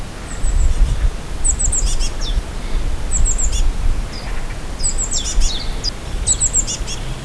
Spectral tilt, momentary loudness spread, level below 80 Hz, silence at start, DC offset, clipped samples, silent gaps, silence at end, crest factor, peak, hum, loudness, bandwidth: -2.5 dB/octave; 11 LU; -18 dBFS; 0 s; 0.4%; under 0.1%; none; 0 s; 14 dB; -2 dBFS; none; -20 LUFS; 11 kHz